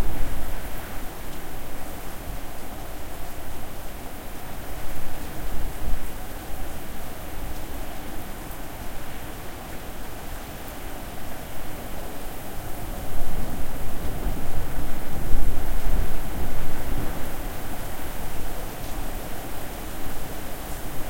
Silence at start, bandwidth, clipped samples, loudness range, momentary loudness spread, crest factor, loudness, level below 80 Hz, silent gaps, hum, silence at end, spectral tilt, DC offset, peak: 0 s; 16.5 kHz; under 0.1%; 5 LU; 6 LU; 18 dB; -35 LUFS; -32 dBFS; none; none; 0 s; -4.5 dB/octave; under 0.1%; -2 dBFS